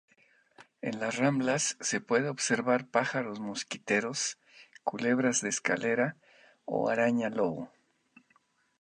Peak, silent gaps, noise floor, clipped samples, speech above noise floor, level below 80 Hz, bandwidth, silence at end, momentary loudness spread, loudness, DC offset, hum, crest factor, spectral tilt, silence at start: -10 dBFS; none; -70 dBFS; under 0.1%; 40 dB; -76 dBFS; 11.5 kHz; 1.15 s; 10 LU; -30 LUFS; under 0.1%; none; 22 dB; -3.5 dB/octave; 0.6 s